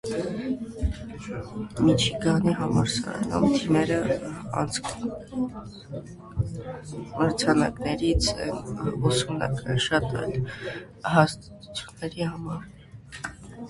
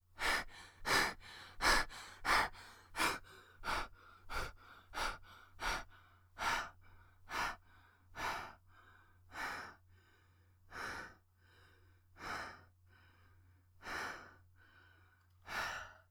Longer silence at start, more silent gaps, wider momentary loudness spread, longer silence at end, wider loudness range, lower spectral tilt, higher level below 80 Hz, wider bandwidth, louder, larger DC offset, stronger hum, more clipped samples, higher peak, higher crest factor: about the same, 0.05 s vs 0.15 s; neither; second, 15 LU vs 21 LU; second, 0 s vs 0.15 s; second, 5 LU vs 14 LU; first, -5.5 dB/octave vs -1.5 dB/octave; first, -42 dBFS vs -56 dBFS; second, 11.5 kHz vs over 20 kHz; first, -26 LUFS vs -40 LUFS; neither; neither; neither; first, -2 dBFS vs -18 dBFS; about the same, 24 dB vs 24 dB